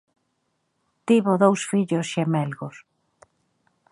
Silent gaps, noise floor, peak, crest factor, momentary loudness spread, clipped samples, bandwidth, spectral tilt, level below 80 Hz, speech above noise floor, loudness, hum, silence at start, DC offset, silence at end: none; -73 dBFS; -4 dBFS; 22 dB; 17 LU; under 0.1%; 11.5 kHz; -6 dB/octave; -74 dBFS; 52 dB; -22 LUFS; none; 1.05 s; under 0.1%; 1.15 s